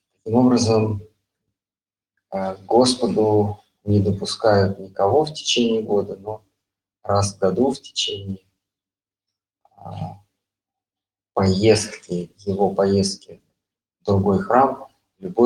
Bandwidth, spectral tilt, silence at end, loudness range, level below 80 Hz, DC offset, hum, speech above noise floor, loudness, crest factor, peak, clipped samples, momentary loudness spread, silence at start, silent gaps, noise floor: 11.5 kHz; -5.5 dB/octave; 0 s; 7 LU; -56 dBFS; under 0.1%; none; over 71 dB; -20 LUFS; 20 dB; -2 dBFS; under 0.1%; 16 LU; 0.25 s; none; under -90 dBFS